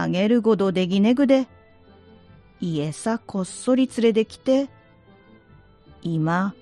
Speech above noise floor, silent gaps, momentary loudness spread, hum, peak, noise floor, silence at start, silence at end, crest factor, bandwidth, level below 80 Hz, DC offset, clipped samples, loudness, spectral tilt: 31 dB; none; 10 LU; none; -6 dBFS; -52 dBFS; 0 s; 0.1 s; 18 dB; 11.5 kHz; -60 dBFS; under 0.1%; under 0.1%; -22 LUFS; -6.5 dB/octave